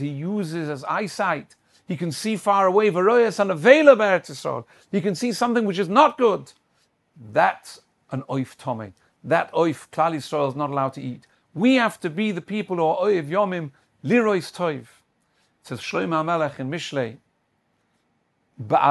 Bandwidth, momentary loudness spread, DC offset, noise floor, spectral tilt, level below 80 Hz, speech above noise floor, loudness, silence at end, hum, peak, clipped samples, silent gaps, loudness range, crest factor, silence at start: 12.5 kHz; 16 LU; under 0.1%; -69 dBFS; -5.5 dB/octave; -70 dBFS; 48 dB; -22 LUFS; 0 s; none; 0 dBFS; under 0.1%; none; 8 LU; 22 dB; 0 s